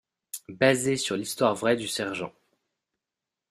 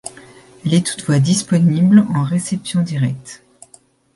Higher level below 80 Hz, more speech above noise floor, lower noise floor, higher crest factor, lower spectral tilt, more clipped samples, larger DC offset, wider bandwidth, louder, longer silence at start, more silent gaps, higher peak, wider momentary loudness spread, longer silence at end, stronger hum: second, -68 dBFS vs -54 dBFS; first, 62 dB vs 35 dB; first, -88 dBFS vs -50 dBFS; first, 24 dB vs 16 dB; second, -4 dB/octave vs -6 dB/octave; neither; neither; first, 15.5 kHz vs 11.5 kHz; second, -26 LUFS vs -16 LUFS; first, 0.35 s vs 0.05 s; neither; second, -6 dBFS vs 0 dBFS; first, 17 LU vs 14 LU; first, 1.2 s vs 0.8 s; neither